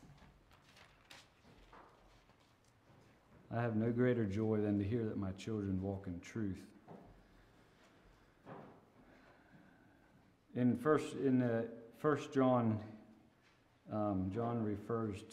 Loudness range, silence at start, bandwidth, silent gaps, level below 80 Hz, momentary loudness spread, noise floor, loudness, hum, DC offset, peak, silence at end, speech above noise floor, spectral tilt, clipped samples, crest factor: 11 LU; 0 s; 12 kHz; none; -72 dBFS; 23 LU; -70 dBFS; -38 LUFS; none; under 0.1%; -20 dBFS; 0 s; 34 dB; -8 dB/octave; under 0.1%; 20 dB